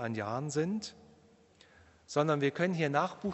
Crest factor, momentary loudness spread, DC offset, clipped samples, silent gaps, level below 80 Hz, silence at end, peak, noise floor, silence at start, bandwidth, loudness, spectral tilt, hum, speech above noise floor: 20 dB; 6 LU; under 0.1%; under 0.1%; none; -74 dBFS; 0 s; -14 dBFS; -63 dBFS; 0 s; 8.2 kHz; -32 LUFS; -6 dB/octave; none; 30 dB